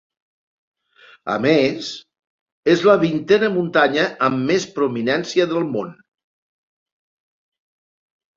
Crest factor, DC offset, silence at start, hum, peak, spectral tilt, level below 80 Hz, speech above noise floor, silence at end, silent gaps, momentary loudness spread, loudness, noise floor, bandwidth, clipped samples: 20 dB; under 0.1%; 1.25 s; none; -2 dBFS; -5.5 dB/octave; -62 dBFS; 33 dB; 2.45 s; 2.27-2.46 s, 2.52-2.63 s; 12 LU; -18 LUFS; -51 dBFS; 7.6 kHz; under 0.1%